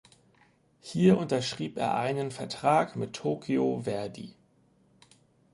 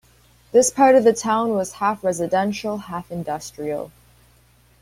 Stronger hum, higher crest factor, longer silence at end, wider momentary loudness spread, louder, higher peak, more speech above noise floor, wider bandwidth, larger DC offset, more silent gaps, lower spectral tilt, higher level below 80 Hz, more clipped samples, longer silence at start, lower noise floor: neither; about the same, 20 dB vs 18 dB; first, 1.25 s vs 0.95 s; about the same, 14 LU vs 15 LU; second, -29 LUFS vs -20 LUFS; second, -10 dBFS vs -2 dBFS; about the same, 37 dB vs 36 dB; second, 11.5 kHz vs 16 kHz; neither; neither; first, -6 dB/octave vs -4.5 dB/octave; second, -66 dBFS vs -56 dBFS; neither; first, 0.85 s vs 0.55 s; first, -65 dBFS vs -55 dBFS